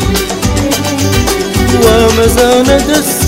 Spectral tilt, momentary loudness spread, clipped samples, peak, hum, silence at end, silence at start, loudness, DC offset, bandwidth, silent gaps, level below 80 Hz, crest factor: -4.5 dB/octave; 6 LU; 0.7%; 0 dBFS; none; 0 s; 0 s; -9 LUFS; under 0.1%; 16.5 kHz; none; -20 dBFS; 10 dB